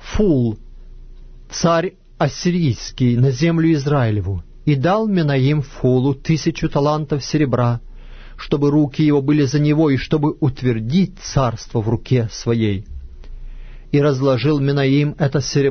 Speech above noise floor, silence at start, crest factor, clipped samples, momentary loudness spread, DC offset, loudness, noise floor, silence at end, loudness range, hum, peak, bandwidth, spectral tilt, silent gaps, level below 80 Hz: 21 dB; 0 s; 14 dB; under 0.1%; 6 LU; under 0.1%; -18 LUFS; -37 dBFS; 0 s; 3 LU; none; -4 dBFS; 6.6 kHz; -7 dB/octave; none; -36 dBFS